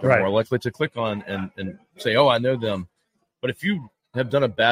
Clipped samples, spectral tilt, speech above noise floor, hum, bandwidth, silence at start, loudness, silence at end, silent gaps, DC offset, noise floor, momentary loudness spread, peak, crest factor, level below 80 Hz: under 0.1%; -6.5 dB/octave; 51 dB; none; 15.5 kHz; 0 s; -23 LUFS; 0 s; none; under 0.1%; -73 dBFS; 14 LU; -2 dBFS; 20 dB; -60 dBFS